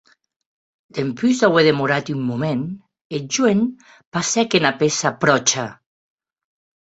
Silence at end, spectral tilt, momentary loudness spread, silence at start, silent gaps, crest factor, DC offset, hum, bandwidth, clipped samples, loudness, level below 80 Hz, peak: 1.2 s; -4 dB/octave; 14 LU; 0.95 s; 3.01-3.10 s, 4.07-4.12 s; 20 dB; under 0.1%; none; 8.2 kHz; under 0.1%; -19 LUFS; -62 dBFS; 0 dBFS